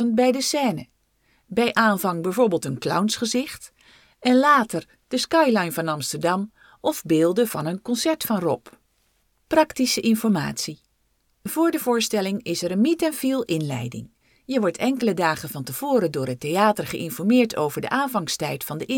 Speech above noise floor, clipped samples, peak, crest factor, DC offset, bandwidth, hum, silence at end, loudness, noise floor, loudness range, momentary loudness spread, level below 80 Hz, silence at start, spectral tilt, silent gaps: 45 dB; under 0.1%; -4 dBFS; 18 dB; under 0.1%; 19 kHz; none; 0 s; -22 LUFS; -67 dBFS; 3 LU; 10 LU; -62 dBFS; 0 s; -4.5 dB/octave; none